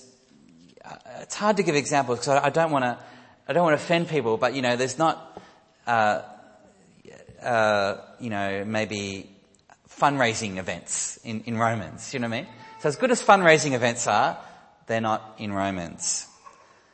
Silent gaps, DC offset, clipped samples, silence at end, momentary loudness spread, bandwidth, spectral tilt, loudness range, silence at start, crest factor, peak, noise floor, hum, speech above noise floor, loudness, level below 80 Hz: none; under 0.1%; under 0.1%; 0.7 s; 14 LU; 8.8 kHz; -4 dB/octave; 5 LU; 0.85 s; 22 dB; -4 dBFS; -57 dBFS; none; 33 dB; -24 LUFS; -66 dBFS